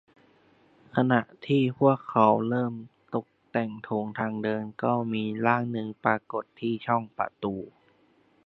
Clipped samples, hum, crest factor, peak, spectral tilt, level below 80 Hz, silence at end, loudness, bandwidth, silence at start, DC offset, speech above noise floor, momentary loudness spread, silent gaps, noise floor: under 0.1%; none; 22 dB; -6 dBFS; -9.5 dB/octave; -68 dBFS; 0.75 s; -28 LUFS; 5.8 kHz; 0.95 s; under 0.1%; 37 dB; 12 LU; none; -64 dBFS